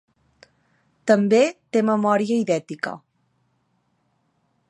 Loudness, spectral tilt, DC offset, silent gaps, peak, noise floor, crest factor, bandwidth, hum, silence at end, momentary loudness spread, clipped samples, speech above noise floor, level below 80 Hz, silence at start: -21 LUFS; -6 dB/octave; under 0.1%; none; -4 dBFS; -68 dBFS; 20 dB; 11 kHz; none; 1.7 s; 13 LU; under 0.1%; 49 dB; -74 dBFS; 1.05 s